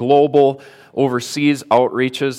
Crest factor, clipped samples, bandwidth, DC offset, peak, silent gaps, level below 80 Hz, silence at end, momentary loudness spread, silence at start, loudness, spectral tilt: 14 dB; under 0.1%; 15 kHz; under 0.1%; -2 dBFS; none; -66 dBFS; 0 s; 8 LU; 0 s; -16 LUFS; -5.5 dB/octave